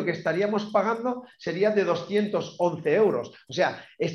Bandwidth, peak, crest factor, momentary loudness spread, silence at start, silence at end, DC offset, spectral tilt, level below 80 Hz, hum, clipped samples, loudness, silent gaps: 11.5 kHz; -10 dBFS; 16 dB; 9 LU; 0 s; 0 s; under 0.1%; -6 dB/octave; -74 dBFS; none; under 0.1%; -26 LUFS; none